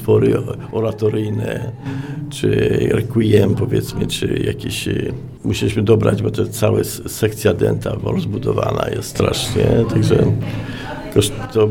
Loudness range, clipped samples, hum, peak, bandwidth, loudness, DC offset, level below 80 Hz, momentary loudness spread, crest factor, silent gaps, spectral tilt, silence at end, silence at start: 1 LU; under 0.1%; none; 0 dBFS; 17 kHz; -18 LUFS; under 0.1%; -38 dBFS; 10 LU; 16 dB; none; -6 dB/octave; 0 s; 0 s